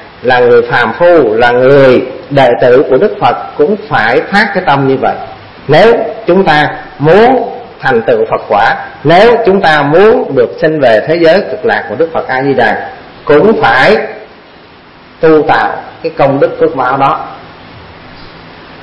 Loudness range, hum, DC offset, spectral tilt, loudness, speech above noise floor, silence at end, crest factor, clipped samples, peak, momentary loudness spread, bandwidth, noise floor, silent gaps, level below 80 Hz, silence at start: 4 LU; none; 1%; -7 dB/octave; -8 LUFS; 28 dB; 0 s; 8 dB; 1%; 0 dBFS; 8 LU; 8.8 kHz; -35 dBFS; none; -40 dBFS; 0 s